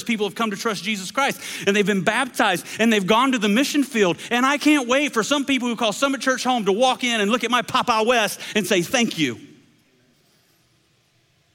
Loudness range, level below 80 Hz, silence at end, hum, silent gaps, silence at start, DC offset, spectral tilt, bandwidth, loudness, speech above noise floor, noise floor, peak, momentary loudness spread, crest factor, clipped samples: 4 LU; -64 dBFS; 2.1 s; none; none; 0 s; under 0.1%; -3.5 dB/octave; 17 kHz; -20 LUFS; 42 dB; -62 dBFS; -4 dBFS; 6 LU; 18 dB; under 0.1%